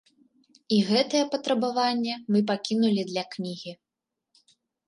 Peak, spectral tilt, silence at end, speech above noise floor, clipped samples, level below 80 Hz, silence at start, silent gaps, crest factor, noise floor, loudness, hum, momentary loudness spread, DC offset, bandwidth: -10 dBFS; -5 dB/octave; 1.15 s; 61 dB; under 0.1%; -76 dBFS; 0.7 s; none; 16 dB; -86 dBFS; -26 LUFS; none; 11 LU; under 0.1%; 11.5 kHz